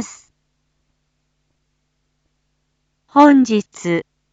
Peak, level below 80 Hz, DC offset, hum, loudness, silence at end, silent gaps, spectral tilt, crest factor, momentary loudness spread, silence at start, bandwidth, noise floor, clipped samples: 0 dBFS; -66 dBFS; under 0.1%; none; -15 LUFS; 0.3 s; none; -5.5 dB/octave; 20 dB; 12 LU; 0 s; 8 kHz; -69 dBFS; under 0.1%